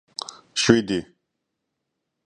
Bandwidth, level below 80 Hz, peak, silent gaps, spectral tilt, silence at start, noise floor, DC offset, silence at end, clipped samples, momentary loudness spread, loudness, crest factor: 11 kHz; -52 dBFS; 0 dBFS; none; -4 dB/octave; 0.55 s; -80 dBFS; under 0.1%; 1.2 s; under 0.1%; 16 LU; -21 LUFS; 26 dB